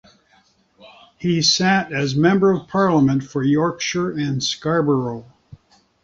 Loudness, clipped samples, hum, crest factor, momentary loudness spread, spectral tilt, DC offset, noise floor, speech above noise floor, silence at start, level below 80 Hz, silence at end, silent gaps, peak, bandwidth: -19 LUFS; under 0.1%; none; 16 dB; 7 LU; -5 dB/octave; under 0.1%; -58 dBFS; 40 dB; 0.85 s; -54 dBFS; 0.5 s; none; -4 dBFS; 7.8 kHz